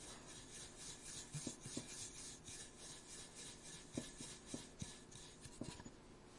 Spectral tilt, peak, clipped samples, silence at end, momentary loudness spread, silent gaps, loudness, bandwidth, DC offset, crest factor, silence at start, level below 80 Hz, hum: -3 dB/octave; -30 dBFS; under 0.1%; 0 s; 7 LU; none; -52 LUFS; 11.5 kHz; under 0.1%; 24 dB; 0 s; -68 dBFS; none